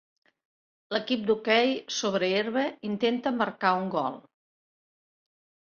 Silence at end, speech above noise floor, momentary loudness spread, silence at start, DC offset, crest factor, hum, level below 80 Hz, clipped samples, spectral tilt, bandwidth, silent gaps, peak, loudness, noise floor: 1.4 s; over 63 dB; 8 LU; 0.9 s; under 0.1%; 20 dB; none; -74 dBFS; under 0.1%; -4 dB/octave; 7.2 kHz; none; -10 dBFS; -27 LUFS; under -90 dBFS